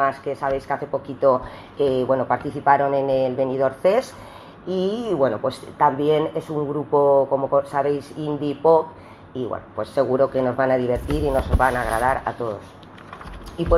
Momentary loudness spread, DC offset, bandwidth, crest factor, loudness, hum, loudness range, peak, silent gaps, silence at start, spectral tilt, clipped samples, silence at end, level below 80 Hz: 13 LU; under 0.1%; 13.5 kHz; 20 dB; -21 LUFS; none; 2 LU; -2 dBFS; none; 0 s; -7 dB/octave; under 0.1%; 0 s; -38 dBFS